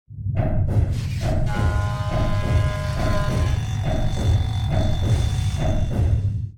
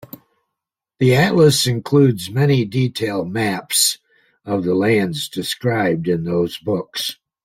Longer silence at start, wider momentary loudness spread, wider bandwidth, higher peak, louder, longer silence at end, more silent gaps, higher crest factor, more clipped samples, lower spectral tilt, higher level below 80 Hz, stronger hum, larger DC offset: second, 0.1 s vs 1 s; second, 3 LU vs 10 LU; second, 13 kHz vs 16.5 kHz; second, -8 dBFS vs -2 dBFS; second, -23 LUFS vs -18 LUFS; second, 0 s vs 0.3 s; neither; about the same, 12 dB vs 16 dB; neither; first, -7 dB/octave vs -5 dB/octave; first, -26 dBFS vs -54 dBFS; neither; first, 0.1% vs under 0.1%